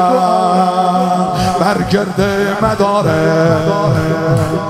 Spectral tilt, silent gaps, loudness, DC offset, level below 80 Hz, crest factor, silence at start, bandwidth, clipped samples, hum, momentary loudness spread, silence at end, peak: -6.5 dB/octave; none; -13 LUFS; under 0.1%; -38 dBFS; 12 dB; 0 s; 15 kHz; under 0.1%; none; 3 LU; 0 s; 0 dBFS